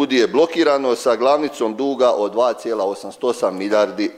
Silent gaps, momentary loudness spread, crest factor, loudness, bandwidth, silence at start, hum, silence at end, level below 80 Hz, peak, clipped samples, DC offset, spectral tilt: none; 6 LU; 16 dB; -18 LUFS; 15 kHz; 0 s; none; 0 s; -66 dBFS; -2 dBFS; under 0.1%; under 0.1%; -4 dB/octave